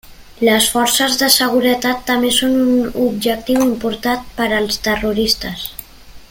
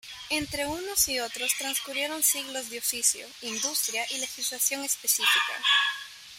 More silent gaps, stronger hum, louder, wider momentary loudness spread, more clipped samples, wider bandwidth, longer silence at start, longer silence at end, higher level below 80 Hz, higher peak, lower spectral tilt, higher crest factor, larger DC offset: neither; neither; first, -15 LUFS vs -26 LUFS; about the same, 8 LU vs 8 LU; neither; about the same, 17 kHz vs 16.5 kHz; about the same, 0.05 s vs 0.05 s; about the same, 0.05 s vs 0 s; first, -40 dBFS vs -60 dBFS; first, 0 dBFS vs -10 dBFS; first, -2.5 dB/octave vs 0.5 dB/octave; about the same, 16 dB vs 20 dB; neither